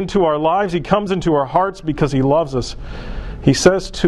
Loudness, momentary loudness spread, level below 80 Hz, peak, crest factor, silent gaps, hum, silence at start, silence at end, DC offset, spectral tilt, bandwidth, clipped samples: -17 LUFS; 15 LU; -32 dBFS; 0 dBFS; 16 dB; none; none; 0 s; 0 s; under 0.1%; -5.5 dB/octave; 12.5 kHz; under 0.1%